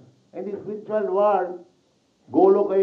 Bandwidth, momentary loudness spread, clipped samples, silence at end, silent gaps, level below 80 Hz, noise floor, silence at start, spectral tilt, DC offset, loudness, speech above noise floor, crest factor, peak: 4.4 kHz; 18 LU; under 0.1%; 0 s; none; -80 dBFS; -64 dBFS; 0.35 s; -9 dB/octave; under 0.1%; -22 LUFS; 43 dB; 18 dB; -6 dBFS